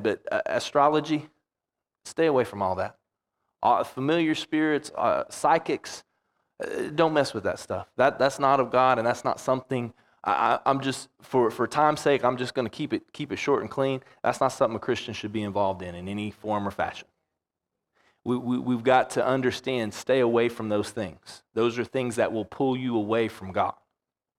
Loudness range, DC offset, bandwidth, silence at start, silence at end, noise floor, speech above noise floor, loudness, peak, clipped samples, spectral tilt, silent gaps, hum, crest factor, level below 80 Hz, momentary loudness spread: 4 LU; under 0.1%; 15.5 kHz; 0 s; 0.65 s; -88 dBFS; 62 dB; -26 LUFS; -6 dBFS; under 0.1%; -5.5 dB/octave; none; none; 20 dB; -66 dBFS; 11 LU